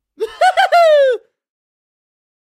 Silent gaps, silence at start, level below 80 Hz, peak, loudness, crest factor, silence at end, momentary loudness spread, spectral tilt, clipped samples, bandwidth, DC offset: none; 0.2 s; -66 dBFS; -2 dBFS; -12 LUFS; 14 dB; 1.3 s; 13 LU; 0.5 dB/octave; under 0.1%; 15 kHz; under 0.1%